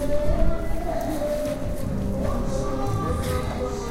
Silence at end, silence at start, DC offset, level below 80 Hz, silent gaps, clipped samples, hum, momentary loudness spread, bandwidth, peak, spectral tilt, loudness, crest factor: 0 s; 0 s; under 0.1%; -28 dBFS; none; under 0.1%; none; 3 LU; 16 kHz; -6 dBFS; -6.5 dB/octave; -27 LUFS; 16 dB